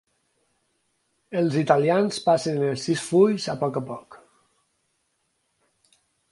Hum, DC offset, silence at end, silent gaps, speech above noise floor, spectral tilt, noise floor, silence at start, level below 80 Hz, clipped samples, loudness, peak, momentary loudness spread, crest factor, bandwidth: none; under 0.1%; 2.15 s; none; 51 dB; -6 dB/octave; -73 dBFS; 1.3 s; -70 dBFS; under 0.1%; -23 LUFS; -2 dBFS; 12 LU; 24 dB; 11.5 kHz